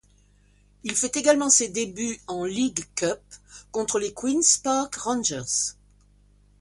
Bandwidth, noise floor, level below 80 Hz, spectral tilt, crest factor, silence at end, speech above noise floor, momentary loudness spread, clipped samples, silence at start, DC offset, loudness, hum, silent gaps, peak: 11.5 kHz; -59 dBFS; -58 dBFS; -2 dB/octave; 22 dB; 0.9 s; 34 dB; 11 LU; under 0.1%; 0.85 s; under 0.1%; -24 LUFS; 50 Hz at -55 dBFS; none; -4 dBFS